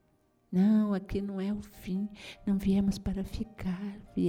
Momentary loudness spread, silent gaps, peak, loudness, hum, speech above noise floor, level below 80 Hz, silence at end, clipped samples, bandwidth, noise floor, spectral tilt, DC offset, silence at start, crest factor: 13 LU; none; -16 dBFS; -32 LUFS; none; 39 dB; -48 dBFS; 0 s; under 0.1%; 15.5 kHz; -69 dBFS; -8 dB/octave; under 0.1%; 0.5 s; 14 dB